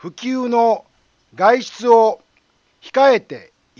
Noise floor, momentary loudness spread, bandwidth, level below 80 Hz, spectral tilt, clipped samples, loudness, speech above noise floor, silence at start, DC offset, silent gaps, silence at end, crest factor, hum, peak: -61 dBFS; 15 LU; 7.4 kHz; -70 dBFS; -4.5 dB/octave; under 0.1%; -16 LUFS; 45 dB; 0.05 s; under 0.1%; none; 0.4 s; 16 dB; none; 0 dBFS